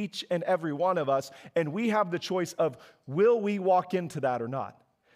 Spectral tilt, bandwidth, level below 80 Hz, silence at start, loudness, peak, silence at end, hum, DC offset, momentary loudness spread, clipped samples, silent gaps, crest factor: -6 dB/octave; 15.5 kHz; -80 dBFS; 0 s; -28 LUFS; -14 dBFS; 0.45 s; none; under 0.1%; 9 LU; under 0.1%; none; 14 dB